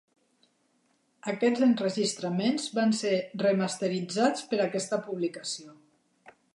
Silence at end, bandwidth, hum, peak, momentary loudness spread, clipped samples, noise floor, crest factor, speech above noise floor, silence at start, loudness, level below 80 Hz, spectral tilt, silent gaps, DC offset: 0.8 s; 11.5 kHz; none; -10 dBFS; 9 LU; under 0.1%; -71 dBFS; 18 dB; 43 dB; 1.25 s; -28 LUFS; -82 dBFS; -4.5 dB/octave; none; under 0.1%